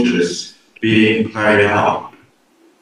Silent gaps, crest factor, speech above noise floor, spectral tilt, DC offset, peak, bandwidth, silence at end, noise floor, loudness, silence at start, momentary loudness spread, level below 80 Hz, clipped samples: none; 16 dB; 40 dB; -5 dB/octave; under 0.1%; 0 dBFS; 10.5 kHz; 0.75 s; -53 dBFS; -15 LUFS; 0 s; 12 LU; -56 dBFS; under 0.1%